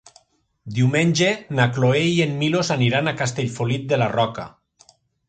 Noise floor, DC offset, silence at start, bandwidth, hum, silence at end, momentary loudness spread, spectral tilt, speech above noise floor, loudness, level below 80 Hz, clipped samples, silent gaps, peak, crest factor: -57 dBFS; under 0.1%; 0.65 s; 9.2 kHz; none; 0.8 s; 7 LU; -5.5 dB/octave; 37 dB; -20 LUFS; -56 dBFS; under 0.1%; none; -2 dBFS; 18 dB